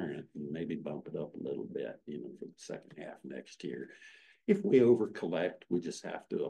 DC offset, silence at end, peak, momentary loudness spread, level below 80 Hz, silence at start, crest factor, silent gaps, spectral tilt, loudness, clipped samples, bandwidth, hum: under 0.1%; 0 s; -14 dBFS; 19 LU; -78 dBFS; 0 s; 20 dB; none; -7 dB/octave; -34 LUFS; under 0.1%; 10 kHz; none